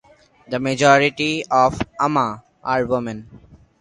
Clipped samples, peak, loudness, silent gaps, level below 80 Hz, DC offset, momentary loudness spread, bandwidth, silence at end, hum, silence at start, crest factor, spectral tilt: under 0.1%; 0 dBFS; -19 LUFS; none; -48 dBFS; under 0.1%; 14 LU; 11.5 kHz; 0.45 s; none; 0.5 s; 20 dB; -5 dB/octave